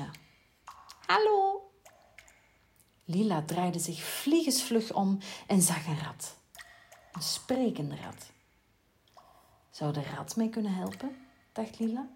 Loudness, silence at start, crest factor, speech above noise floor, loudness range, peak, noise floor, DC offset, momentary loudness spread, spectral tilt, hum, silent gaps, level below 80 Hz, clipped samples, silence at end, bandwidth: -31 LUFS; 0 s; 22 dB; 38 dB; 8 LU; -12 dBFS; -69 dBFS; under 0.1%; 24 LU; -4.5 dB/octave; none; none; -72 dBFS; under 0.1%; 0 s; 16.5 kHz